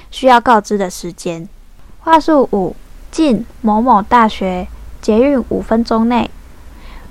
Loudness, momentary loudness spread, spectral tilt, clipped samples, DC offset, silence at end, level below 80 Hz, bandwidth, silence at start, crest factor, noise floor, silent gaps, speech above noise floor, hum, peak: -13 LUFS; 14 LU; -5.5 dB/octave; 0.4%; under 0.1%; 0 s; -34 dBFS; 14 kHz; 0.1 s; 14 dB; -36 dBFS; none; 23 dB; none; 0 dBFS